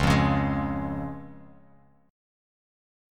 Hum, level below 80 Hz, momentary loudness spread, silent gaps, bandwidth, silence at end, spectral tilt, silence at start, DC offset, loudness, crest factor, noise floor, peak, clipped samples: none; -40 dBFS; 19 LU; none; 13.5 kHz; 1.7 s; -6.5 dB/octave; 0 s; under 0.1%; -27 LUFS; 20 dB; -58 dBFS; -8 dBFS; under 0.1%